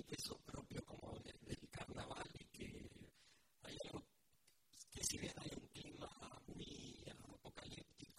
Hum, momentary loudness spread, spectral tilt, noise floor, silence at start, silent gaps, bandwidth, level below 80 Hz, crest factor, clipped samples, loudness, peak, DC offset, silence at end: none; 12 LU; -3.5 dB/octave; -79 dBFS; 0 s; none; 16 kHz; -68 dBFS; 26 dB; under 0.1%; -53 LUFS; -28 dBFS; under 0.1%; 0 s